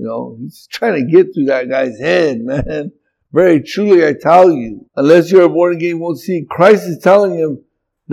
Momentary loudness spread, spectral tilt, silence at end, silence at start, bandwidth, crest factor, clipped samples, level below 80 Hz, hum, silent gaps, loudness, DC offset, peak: 15 LU; -7 dB/octave; 0 s; 0 s; 13.5 kHz; 12 dB; 0.4%; -44 dBFS; none; none; -12 LUFS; under 0.1%; 0 dBFS